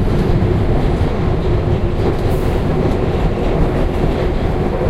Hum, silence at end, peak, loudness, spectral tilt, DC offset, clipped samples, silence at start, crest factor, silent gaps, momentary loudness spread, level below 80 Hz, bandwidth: none; 0 s; -2 dBFS; -17 LUFS; -8.5 dB/octave; under 0.1%; under 0.1%; 0 s; 12 dB; none; 2 LU; -20 dBFS; 13 kHz